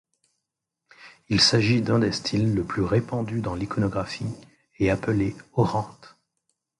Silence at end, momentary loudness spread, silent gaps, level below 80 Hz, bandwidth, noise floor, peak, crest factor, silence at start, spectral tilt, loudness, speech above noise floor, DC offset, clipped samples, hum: 0.7 s; 12 LU; none; -48 dBFS; 11.5 kHz; -83 dBFS; -6 dBFS; 20 dB; 1 s; -5.5 dB/octave; -24 LUFS; 60 dB; under 0.1%; under 0.1%; none